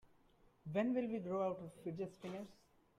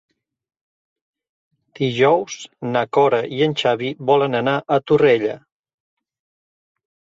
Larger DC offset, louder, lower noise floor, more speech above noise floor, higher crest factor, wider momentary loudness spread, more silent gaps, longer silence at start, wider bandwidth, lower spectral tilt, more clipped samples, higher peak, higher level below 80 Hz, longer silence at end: neither; second, -42 LUFS vs -18 LUFS; second, -71 dBFS vs under -90 dBFS; second, 29 dB vs over 72 dB; about the same, 18 dB vs 18 dB; first, 13 LU vs 10 LU; neither; second, 0.65 s vs 1.8 s; first, 12 kHz vs 7.8 kHz; first, -8 dB/octave vs -5.5 dB/octave; neither; second, -26 dBFS vs -4 dBFS; second, -78 dBFS vs -64 dBFS; second, 0.45 s vs 1.75 s